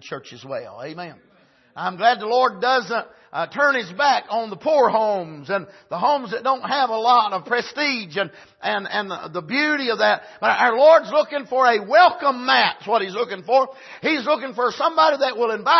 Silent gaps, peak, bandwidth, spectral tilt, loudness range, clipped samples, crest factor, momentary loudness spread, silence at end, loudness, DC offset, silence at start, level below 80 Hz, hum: none; -2 dBFS; 6.2 kHz; -4 dB/octave; 5 LU; under 0.1%; 18 dB; 13 LU; 0 s; -20 LUFS; under 0.1%; 0.05 s; -74 dBFS; none